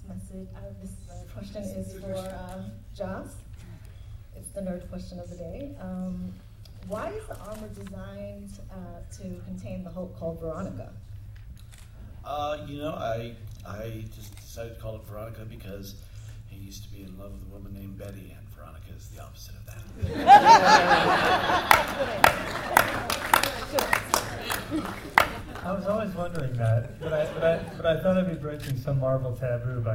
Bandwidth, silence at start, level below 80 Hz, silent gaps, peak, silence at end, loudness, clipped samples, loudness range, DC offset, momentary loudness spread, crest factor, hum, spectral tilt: 16.5 kHz; 0 s; -46 dBFS; none; 0 dBFS; 0 s; -24 LUFS; under 0.1%; 21 LU; under 0.1%; 23 LU; 28 dB; none; -4.5 dB/octave